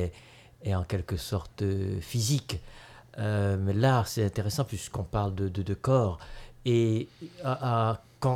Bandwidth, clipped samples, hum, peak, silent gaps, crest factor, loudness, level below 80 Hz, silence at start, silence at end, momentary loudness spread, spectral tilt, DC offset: 16 kHz; under 0.1%; none; -12 dBFS; none; 18 dB; -30 LUFS; -48 dBFS; 0 s; 0 s; 11 LU; -6 dB/octave; under 0.1%